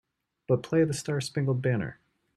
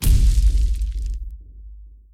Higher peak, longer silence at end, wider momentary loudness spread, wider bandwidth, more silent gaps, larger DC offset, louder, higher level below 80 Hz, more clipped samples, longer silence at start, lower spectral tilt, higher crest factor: second, -12 dBFS vs -6 dBFS; first, 0.45 s vs 0.25 s; second, 5 LU vs 24 LU; second, 13 kHz vs 16.5 kHz; neither; neither; second, -28 LUFS vs -22 LUFS; second, -64 dBFS vs -18 dBFS; neither; first, 0.5 s vs 0 s; first, -6.5 dB/octave vs -5 dB/octave; about the same, 16 dB vs 12 dB